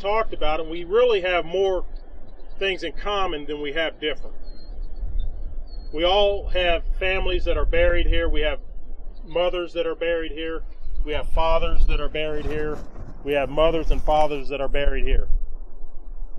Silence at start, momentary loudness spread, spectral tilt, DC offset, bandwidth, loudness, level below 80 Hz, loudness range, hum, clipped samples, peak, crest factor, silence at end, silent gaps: 0 s; 20 LU; -6 dB/octave; under 0.1%; 6 kHz; -24 LUFS; -26 dBFS; 5 LU; none; under 0.1%; -4 dBFS; 16 dB; 0 s; none